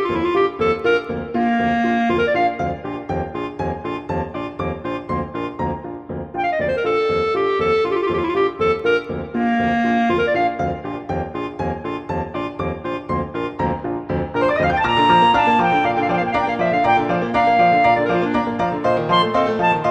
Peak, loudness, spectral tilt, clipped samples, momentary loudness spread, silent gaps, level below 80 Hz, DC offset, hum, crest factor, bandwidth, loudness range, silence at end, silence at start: -4 dBFS; -19 LUFS; -7 dB/octave; under 0.1%; 11 LU; none; -42 dBFS; under 0.1%; none; 16 dB; 8.8 kHz; 8 LU; 0 s; 0 s